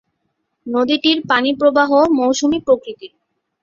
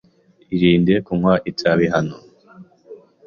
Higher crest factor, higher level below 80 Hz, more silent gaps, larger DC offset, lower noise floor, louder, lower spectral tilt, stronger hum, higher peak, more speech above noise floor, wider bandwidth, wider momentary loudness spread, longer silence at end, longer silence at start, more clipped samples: about the same, 16 dB vs 16 dB; second, -56 dBFS vs -48 dBFS; neither; neither; first, -71 dBFS vs -46 dBFS; first, -15 LUFS vs -18 LUFS; second, -3 dB/octave vs -7.5 dB/octave; neither; about the same, -2 dBFS vs -2 dBFS; first, 56 dB vs 29 dB; about the same, 7.6 kHz vs 7 kHz; first, 13 LU vs 8 LU; first, 0.55 s vs 0.3 s; first, 0.65 s vs 0.5 s; neither